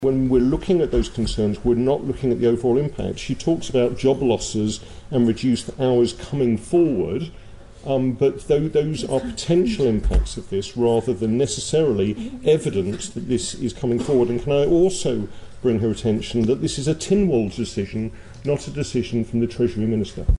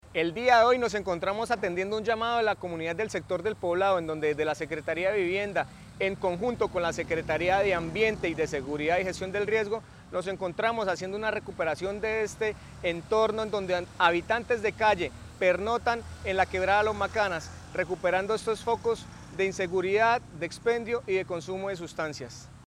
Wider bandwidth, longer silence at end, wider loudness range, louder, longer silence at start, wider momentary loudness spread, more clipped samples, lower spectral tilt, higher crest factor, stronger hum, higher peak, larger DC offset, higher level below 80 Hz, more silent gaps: second, 11.5 kHz vs 13.5 kHz; about the same, 0.05 s vs 0 s; about the same, 2 LU vs 3 LU; first, -21 LUFS vs -28 LUFS; about the same, 0 s vs 0.05 s; about the same, 8 LU vs 9 LU; neither; first, -6.5 dB/octave vs -4.5 dB/octave; second, 14 dB vs 22 dB; neither; about the same, -6 dBFS vs -6 dBFS; neither; first, -34 dBFS vs -54 dBFS; neither